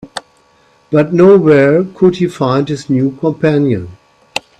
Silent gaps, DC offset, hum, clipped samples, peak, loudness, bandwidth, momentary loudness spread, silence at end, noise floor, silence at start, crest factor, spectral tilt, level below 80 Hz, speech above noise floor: none; under 0.1%; none; under 0.1%; 0 dBFS; -11 LUFS; 11 kHz; 16 LU; 0.2 s; -50 dBFS; 0.05 s; 12 dB; -7.5 dB/octave; -50 dBFS; 40 dB